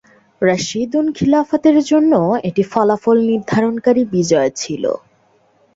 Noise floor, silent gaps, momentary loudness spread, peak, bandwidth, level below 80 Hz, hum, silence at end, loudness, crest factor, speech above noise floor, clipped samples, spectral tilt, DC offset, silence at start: -56 dBFS; none; 7 LU; -2 dBFS; 7.8 kHz; -54 dBFS; none; 0.8 s; -15 LUFS; 14 dB; 41 dB; under 0.1%; -5.5 dB/octave; under 0.1%; 0.4 s